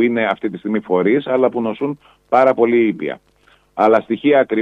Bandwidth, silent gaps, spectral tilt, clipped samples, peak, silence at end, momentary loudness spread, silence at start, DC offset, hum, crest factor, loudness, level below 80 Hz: 6.2 kHz; none; -8 dB/octave; under 0.1%; 0 dBFS; 0 s; 11 LU; 0 s; under 0.1%; none; 16 dB; -17 LUFS; -62 dBFS